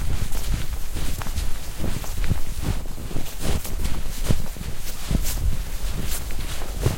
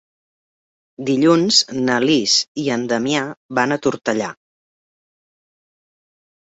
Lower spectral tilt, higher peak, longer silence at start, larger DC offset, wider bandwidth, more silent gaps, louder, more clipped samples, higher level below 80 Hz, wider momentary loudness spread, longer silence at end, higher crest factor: about the same, -4.5 dB/octave vs -3.5 dB/octave; about the same, -4 dBFS vs -2 dBFS; second, 0 s vs 1 s; neither; first, 16.5 kHz vs 8.2 kHz; second, none vs 2.48-2.55 s, 3.37-3.49 s; second, -29 LUFS vs -17 LUFS; neither; first, -26 dBFS vs -62 dBFS; second, 6 LU vs 9 LU; second, 0 s vs 2.15 s; about the same, 16 dB vs 20 dB